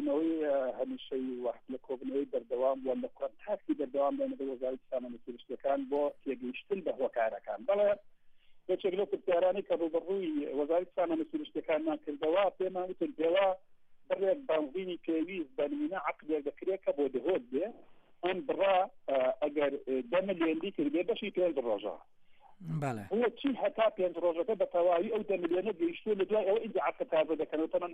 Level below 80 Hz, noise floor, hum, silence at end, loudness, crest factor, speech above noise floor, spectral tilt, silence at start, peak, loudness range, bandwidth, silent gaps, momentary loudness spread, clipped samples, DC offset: -72 dBFS; -56 dBFS; none; 0 s; -33 LUFS; 14 dB; 24 dB; -7.5 dB/octave; 0 s; -18 dBFS; 4 LU; 8.4 kHz; none; 9 LU; under 0.1%; under 0.1%